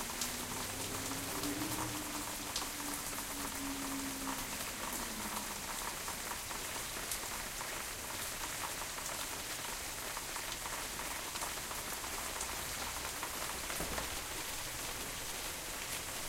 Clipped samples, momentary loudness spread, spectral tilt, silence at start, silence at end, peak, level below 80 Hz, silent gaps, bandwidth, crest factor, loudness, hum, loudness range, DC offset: under 0.1%; 2 LU; -1.5 dB/octave; 0 s; 0 s; -16 dBFS; -56 dBFS; none; 16 kHz; 24 dB; -39 LUFS; none; 1 LU; under 0.1%